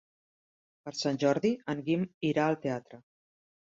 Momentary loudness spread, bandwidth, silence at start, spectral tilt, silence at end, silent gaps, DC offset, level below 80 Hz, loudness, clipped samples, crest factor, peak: 11 LU; 7.8 kHz; 0.85 s; -6 dB/octave; 0.7 s; 2.14-2.21 s; under 0.1%; -72 dBFS; -31 LUFS; under 0.1%; 20 dB; -12 dBFS